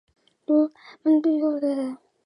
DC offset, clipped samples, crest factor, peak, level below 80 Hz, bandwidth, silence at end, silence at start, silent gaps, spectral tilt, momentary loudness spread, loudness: under 0.1%; under 0.1%; 14 dB; -10 dBFS; -82 dBFS; 10 kHz; 0.3 s; 0.5 s; none; -6.5 dB/octave; 10 LU; -23 LUFS